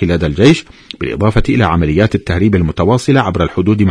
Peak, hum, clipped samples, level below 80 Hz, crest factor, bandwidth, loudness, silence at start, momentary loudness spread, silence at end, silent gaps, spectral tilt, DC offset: 0 dBFS; none; 0.2%; -26 dBFS; 12 dB; 10.5 kHz; -12 LUFS; 0 s; 6 LU; 0 s; none; -7 dB/octave; under 0.1%